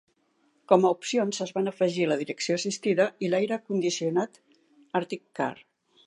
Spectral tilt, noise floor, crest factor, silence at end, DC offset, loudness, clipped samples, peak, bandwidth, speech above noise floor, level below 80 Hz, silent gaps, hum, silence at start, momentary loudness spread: -4.5 dB/octave; -69 dBFS; 22 dB; 0.55 s; under 0.1%; -27 LUFS; under 0.1%; -4 dBFS; 11 kHz; 42 dB; -80 dBFS; none; none; 0.7 s; 9 LU